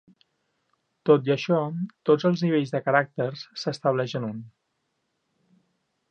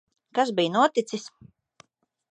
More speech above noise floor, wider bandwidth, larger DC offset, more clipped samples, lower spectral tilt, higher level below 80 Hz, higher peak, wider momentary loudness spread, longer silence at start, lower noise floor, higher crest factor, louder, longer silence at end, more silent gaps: first, 52 dB vs 35 dB; second, 8.6 kHz vs 10.5 kHz; neither; neither; first, -7 dB/octave vs -4.5 dB/octave; about the same, -76 dBFS vs -76 dBFS; first, -4 dBFS vs -8 dBFS; second, 10 LU vs 14 LU; first, 1.05 s vs 0.35 s; first, -76 dBFS vs -59 dBFS; about the same, 22 dB vs 20 dB; about the same, -25 LUFS vs -25 LUFS; first, 1.65 s vs 1.05 s; neither